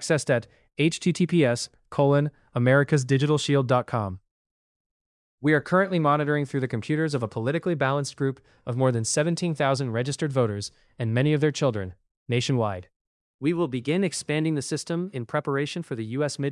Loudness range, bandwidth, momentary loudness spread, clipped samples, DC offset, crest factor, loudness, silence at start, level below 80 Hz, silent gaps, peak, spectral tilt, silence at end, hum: 4 LU; 12 kHz; 9 LU; under 0.1%; under 0.1%; 18 dB; -25 LUFS; 0 s; -66 dBFS; 4.31-4.45 s, 4.51-5.38 s, 12.11-12.26 s, 12.96-13.39 s; -8 dBFS; -5.5 dB/octave; 0 s; none